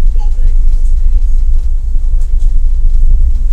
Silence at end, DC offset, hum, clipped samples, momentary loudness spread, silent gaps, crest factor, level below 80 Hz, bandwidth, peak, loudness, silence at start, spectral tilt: 0 s; under 0.1%; none; 1%; 3 LU; none; 6 dB; -6 dBFS; 0.9 kHz; 0 dBFS; -16 LUFS; 0 s; -7.5 dB/octave